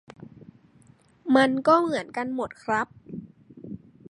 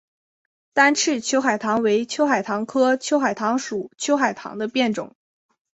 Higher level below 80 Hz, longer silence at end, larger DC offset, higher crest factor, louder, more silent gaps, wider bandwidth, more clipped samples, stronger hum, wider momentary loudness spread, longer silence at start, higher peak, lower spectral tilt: about the same, -66 dBFS vs -68 dBFS; second, 0.35 s vs 0.7 s; neither; about the same, 22 dB vs 20 dB; second, -24 LUFS vs -21 LUFS; neither; first, 11 kHz vs 8.2 kHz; neither; neither; first, 22 LU vs 9 LU; second, 0.2 s vs 0.75 s; second, -6 dBFS vs -2 dBFS; first, -5.5 dB/octave vs -3 dB/octave